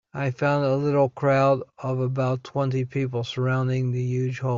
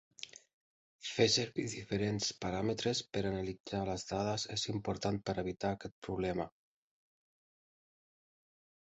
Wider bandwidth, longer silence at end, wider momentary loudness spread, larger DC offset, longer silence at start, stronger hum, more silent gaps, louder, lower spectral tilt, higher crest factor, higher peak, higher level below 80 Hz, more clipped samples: second, 7.2 kHz vs 8.2 kHz; second, 0 s vs 2.35 s; second, 6 LU vs 10 LU; neither; about the same, 0.15 s vs 0.2 s; neither; second, none vs 0.53-0.99 s, 3.60-3.64 s, 5.92-6.02 s; first, -24 LUFS vs -36 LUFS; first, -8 dB/octave vs -4 dB/octave; second, 14 dB vs 22 dB; first, -8 dBFS vs -16 dBFS; about the same, -62 dBFS vs -60 dBFS; neither